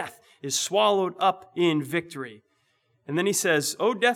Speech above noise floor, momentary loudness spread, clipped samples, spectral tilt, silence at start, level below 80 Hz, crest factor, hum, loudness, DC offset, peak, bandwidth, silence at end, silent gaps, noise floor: 45 dB; 16 LU; under 0.1%; -3 dB/octave; 0 s; -80 dBFS; 18 dB; none; -24 LUFS; under 0.1%; -8 dBFS; 18 kHz; 0 s; none; -69 dBFS